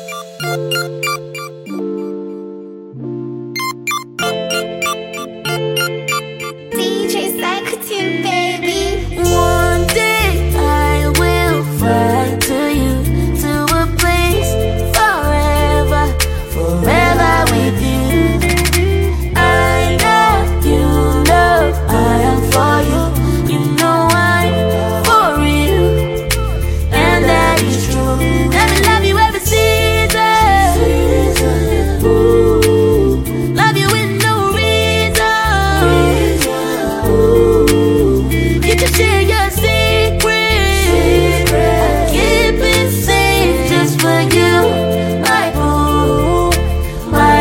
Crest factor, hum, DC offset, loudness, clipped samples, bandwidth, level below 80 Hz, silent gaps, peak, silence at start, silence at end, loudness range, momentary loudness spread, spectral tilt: 12 dB; none; under 0.1%; -13 LUFS; under 0.1%; 16.5 kHz; -20 dBFS; none; 0 dBFS; 0 s; 0 s; 7 LU; 9 LU; -5 dB/octave